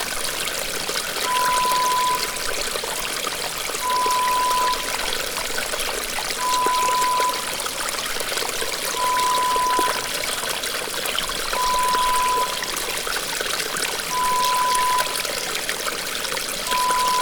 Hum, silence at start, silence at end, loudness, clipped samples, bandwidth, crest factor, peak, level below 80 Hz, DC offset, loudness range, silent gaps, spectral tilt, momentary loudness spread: none; 0 s; 0 s; -21 LUFS; under 0.1%; over 20 kHz; 16 dB; -8 dBFS; -44 dBFS; under 0.1%; 1 LU; none; 0 dB/octave; 5 LU